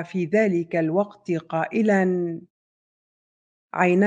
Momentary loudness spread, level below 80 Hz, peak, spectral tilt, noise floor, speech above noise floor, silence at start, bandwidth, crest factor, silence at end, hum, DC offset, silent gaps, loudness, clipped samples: 10 LU; -72 dBFS; -4 dBFS; -8 dB/octave; under -90 dBFS; over 68 dB; 0 s; 8.6 kHz; 18 dB; 0 s; none; under 0.1%; 2.50-3.68 s; -23 LUFS; under 0.1%